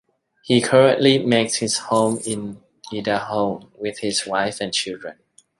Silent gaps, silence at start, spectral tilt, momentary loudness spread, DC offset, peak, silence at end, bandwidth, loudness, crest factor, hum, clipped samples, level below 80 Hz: none; 0.45 s; -4 dB/octave; 16 LU; under 0.1%; -2 dBFS; 0.5 s; 11.5 kHz; -20 LUFS; 18 dB; none; under 0.1%; -62 dBFS